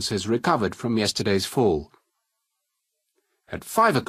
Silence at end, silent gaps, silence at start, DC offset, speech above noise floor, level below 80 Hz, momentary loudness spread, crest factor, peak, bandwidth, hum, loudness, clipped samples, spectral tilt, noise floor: 0.05 s; none; 0 s; under 0.1%; 56 dB; -54 dBFS; 8 LU; 20 dB; -6 dBFS; 15.5 kHz; none; -23 LUFS; under 0.1%; -4.5 dB/octave; -79 dBFS